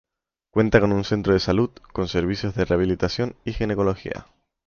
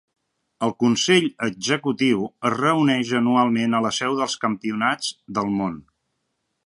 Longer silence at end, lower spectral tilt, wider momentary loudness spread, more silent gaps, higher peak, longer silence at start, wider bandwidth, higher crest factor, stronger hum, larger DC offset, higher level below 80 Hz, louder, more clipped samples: second, 0.45 s vs 0.85 s; first, -7 dB/octave vs -4.5 dB/octave; about the same, 9 LU vs 8 LU; neither; about the same, -4 dBFS vs -4 dBFS; about the same, 0.55 s vs 0.6 s; second, 7 kHz vs 11.5 kHz; about the same, 20 dB vs 18 dB; neither; neither; first, -40 dBFS vs -64 dBFS; about the same, -23 LUFS vs -21 LUFS; neither